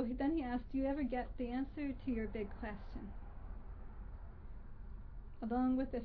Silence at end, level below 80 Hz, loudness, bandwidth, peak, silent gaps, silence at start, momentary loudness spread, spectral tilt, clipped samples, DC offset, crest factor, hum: 0 s; -50 dBFS; -40 LUFS; 4.9 kHz; -24 dBFS; none; 0 s; 18 LU; -7 dB/octave; under 0.1%; under 0.1%; 16 dB; none